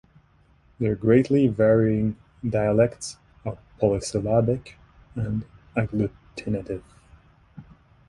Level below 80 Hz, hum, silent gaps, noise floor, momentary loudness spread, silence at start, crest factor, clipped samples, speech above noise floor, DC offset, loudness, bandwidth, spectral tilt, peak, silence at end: -48 dBFS; none; none; -59 dBFS; 17 LU; 0.8 s; 20 dB; under 0.1%; 36 dB; under 0.1%; -24 LUFS; 11.5 kHz; -7.5 dB/octave; -6 dBFS; 0.45 s